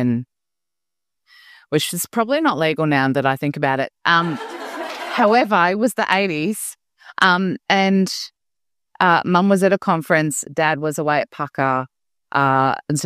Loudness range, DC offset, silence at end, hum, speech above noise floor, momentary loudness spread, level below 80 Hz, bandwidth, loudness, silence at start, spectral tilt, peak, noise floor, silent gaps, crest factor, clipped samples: 2 LU; under 0.1%; 0 s; none; 68 dB; 11 LU; -66 dBFS; 15.5 kHz; -18 LUFS; 0 s; -4.5 dB/octave; 0 dBFS; -86 dBFS; none; 20 dB; under 0.1%